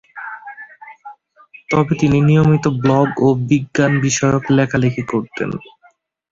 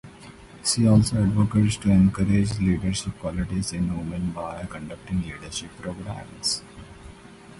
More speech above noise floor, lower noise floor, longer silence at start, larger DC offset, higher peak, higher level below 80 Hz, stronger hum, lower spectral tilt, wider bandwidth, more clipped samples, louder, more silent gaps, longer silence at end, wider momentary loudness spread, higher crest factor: first, 39 dB vs 22 dB; first, -54 dBFS vs -45 dBFS; about the same, 0.15 s vs 0.05 s; neither; first, -2 dBFS vs -6 dBFS; second, -46 dBFS vs -40 dBFS; neither; about the same, -6.5 dB/octave vs -5.5 dB/octave; second, 7.8 kHz vs 11.5 kHz; neither; first, -16 LUFS vs -24 LUFS; neither; first, 0.7 s vs 0 s; first, 20 LU vs 16 LU; about the same, 14 dB vs 18 dB